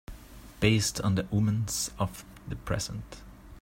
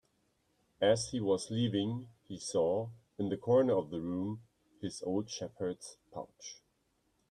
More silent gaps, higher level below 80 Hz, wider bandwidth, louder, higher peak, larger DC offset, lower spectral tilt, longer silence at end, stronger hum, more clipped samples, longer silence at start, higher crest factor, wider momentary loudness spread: neither; first, -48 dBFS vs -70 dBFS; first, 16.5 kHz vs 11.5 kHz; first, -29 LUFS vs -34 LUFS; first, -10 dBFS vs -16 dBFS; neither; about the same, -4.5 dB/octave vs -5.5 dB/octave; second, 0 s vs 0.75 s; neither; neither; second, 0.1 s vs 0.8 s; about the same, 20 dB vs 20 dB; first, 22 LU vs 17 LU